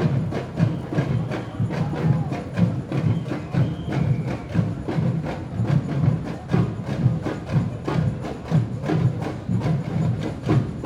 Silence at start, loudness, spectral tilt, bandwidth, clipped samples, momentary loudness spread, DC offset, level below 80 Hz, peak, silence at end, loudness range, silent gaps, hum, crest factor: 0 s; -24 LUFS; -8.5 dB/octave; 10.5 kHz; under 0.1%; 4 LU; under 0.1%; -44 dBFS; -6 dBFS; 0 s; 0 LU; none; none; 18 dB